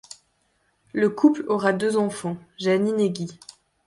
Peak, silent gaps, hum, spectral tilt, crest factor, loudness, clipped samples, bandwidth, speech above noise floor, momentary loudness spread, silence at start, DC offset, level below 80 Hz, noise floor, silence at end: -6 dBFS; none; none; -6 dB/octave; 18 dB; -23 LUFS; under 0.1%; 11.5 kHz; 46 dB; 13 LU; 0.95 s; under 0.1%; -66 dBFS; -68 dBFS; 0.55 s